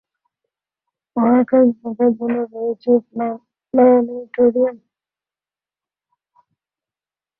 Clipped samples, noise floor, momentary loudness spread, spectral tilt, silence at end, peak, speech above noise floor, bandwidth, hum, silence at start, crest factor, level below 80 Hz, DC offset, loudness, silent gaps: under 0.1%; under -90 dBFS; 12 LU; -11.5 dB/octave; 2.65 s; -4 dBFS; over 74 dB; 4.3 kHz; 50 Hz at -65 dBFS; 1.15 s; 16 dB; -66 dBFS; under 0.1%; -17 LUFS; none